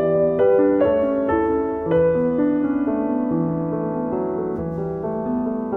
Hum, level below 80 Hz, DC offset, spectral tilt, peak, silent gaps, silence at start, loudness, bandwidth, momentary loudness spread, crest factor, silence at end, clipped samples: none; -46 dBFS; under 0.1%; -11 dB/octave; -6 dBFS; none; 0 s; -21 LUFS; 3.7 kHz; 8 LU; 14 dB; 0 s; under 0.1%